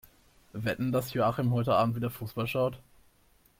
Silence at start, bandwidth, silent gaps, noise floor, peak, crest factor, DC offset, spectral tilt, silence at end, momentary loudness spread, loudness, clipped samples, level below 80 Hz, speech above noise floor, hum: 0.55 s; 16.5 kHz; none; -64 dBFS; -14 dBFS; 18 dB; under 0.1%; -7 dB/octave; 0.8 s; 8 LU; -30 LUFS; under 0.1%; -60 dBFS; 35 dB; none